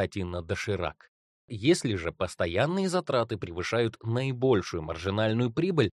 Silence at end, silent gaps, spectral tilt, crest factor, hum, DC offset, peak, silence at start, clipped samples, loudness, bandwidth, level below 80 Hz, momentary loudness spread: 0.05 s; 1.08-1.48 s; -6 dB/octave; 20 dB; none; under 0.1%; -10 dBFS; 0 s; under 0.1%; -29 LUFS; 12.5 kHz; -54 dBFS; 7 LU